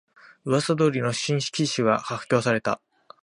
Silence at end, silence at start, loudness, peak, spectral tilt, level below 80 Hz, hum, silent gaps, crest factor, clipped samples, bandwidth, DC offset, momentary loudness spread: 0.5 s; 0.45 s; -24 LUFS; -6 dBFS; -5 dB/octave; -64 dBFS; none; none; 20 dB; under 0.1%; 11.5 kHz; under 0.1%; 5 LU